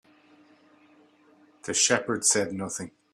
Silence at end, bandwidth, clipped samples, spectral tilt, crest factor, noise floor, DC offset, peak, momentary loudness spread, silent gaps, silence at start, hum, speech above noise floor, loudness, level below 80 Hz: 0.25 s; 15 kHz; under 0.1%; -1.5 dB/octave; 22 dB; -59 dBFS; under 0.1%; -8 dBFS; 13 LU; none; 1.65 s; none; 33 dB; -25 LUFS; -70 dBFS